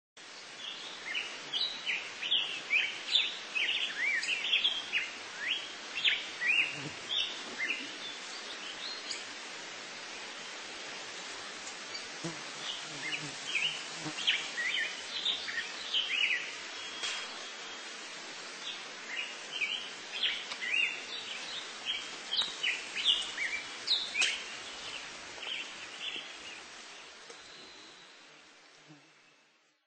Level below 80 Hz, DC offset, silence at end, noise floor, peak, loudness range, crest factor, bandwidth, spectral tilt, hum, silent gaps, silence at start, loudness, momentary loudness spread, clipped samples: -78 dBFS; under 0.1%; 0.75 s; -68 dBFS; -14 dBFS; 11 LU; 24 dB; 8.8 kHz; 0 dB/octave; none; none; 0.15 s; -34 LUFS; 13 LU; under 0.1%